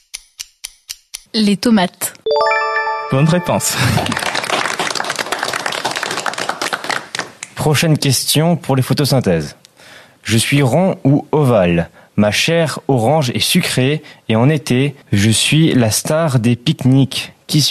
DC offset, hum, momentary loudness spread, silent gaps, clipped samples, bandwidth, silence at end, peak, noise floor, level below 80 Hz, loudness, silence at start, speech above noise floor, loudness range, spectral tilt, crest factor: under 0.1%; none; 10 LU; none; under 0.1%; 14.5 kHz; 0 s; -2 dBFS; -42 dBFS; -44 dBFS; -15 LUFS; 0.15 s; 28 dB; 4 LU; -4.5 dB/octave; 14 dB